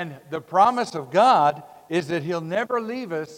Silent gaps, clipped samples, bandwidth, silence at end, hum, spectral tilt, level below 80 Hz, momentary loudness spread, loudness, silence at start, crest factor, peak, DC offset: none; under 0.1%; 16 kHz; 0 s; none; -5.5 dB/octave; -72 dBFS; 12 LU; -22 LUFS; 0 s; 18 dB; -4 dBFS; under 0.1%